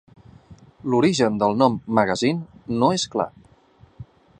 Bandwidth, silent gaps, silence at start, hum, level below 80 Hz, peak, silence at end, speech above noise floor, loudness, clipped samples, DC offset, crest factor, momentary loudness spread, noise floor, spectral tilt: 10 kHz; none; 0.5 s; none; -56 dBFS; -2 dBFS; 0.35 s; 33 dB; -21 LUFS; under 0.1%; under 0.1%; 22 dB; 11 LU; -54 dBFS; -5.5 dB/octave